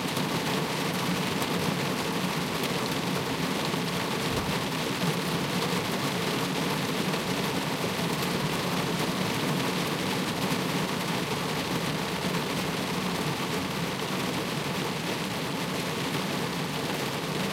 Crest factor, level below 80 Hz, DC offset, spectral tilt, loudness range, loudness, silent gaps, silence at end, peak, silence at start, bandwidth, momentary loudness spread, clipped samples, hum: 16 dB; -56 dBFS; under 0.1%; -4 dB/octave; 2 LU; -29 LUFS; none; 0 s; -14 dBFS; 0 s; 16 kHz; 2 LU; under 0.1%; none